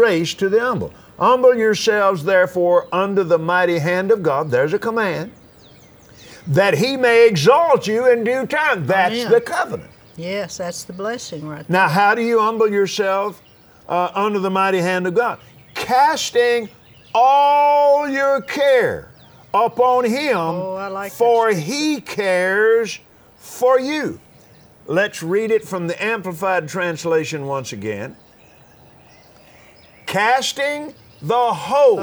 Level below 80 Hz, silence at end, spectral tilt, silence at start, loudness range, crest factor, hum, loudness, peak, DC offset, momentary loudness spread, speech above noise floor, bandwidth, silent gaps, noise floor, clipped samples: -60 dBFS; 0 s; -4.5 dB/octave; 0 s; 6 LU; 18 dB; none; -17 LUFS; 0 dBFS; under 0.1%; 13 LU; 31 dB; over 20 kHz; none; -48 dBFS; under 0.1%